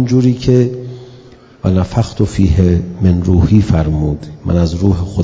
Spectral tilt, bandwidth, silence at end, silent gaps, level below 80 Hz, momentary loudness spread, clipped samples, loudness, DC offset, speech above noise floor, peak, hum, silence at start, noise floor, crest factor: -8.5 dB/octave; 8 kHz; 0 s; none; -22 dBFS; 9 LU; 0.4%; -13 LUFS; under 0.1%; 27 dB; 0 dBFS; none; 0 s; -39 dBFS; 12 dB